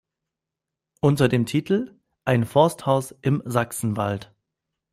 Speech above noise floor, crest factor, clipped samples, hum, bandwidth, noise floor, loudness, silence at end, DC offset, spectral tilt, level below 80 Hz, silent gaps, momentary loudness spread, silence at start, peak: 64 dB; 20 dB; under 0.1%; none; 15.5 kHz; -86 dBFS; -23 LUFS; 0.7 s; under 0.1%; -6.5 dB/octave; -58 dBFS; none; 8 LU; 1.05 s; -4 dBFS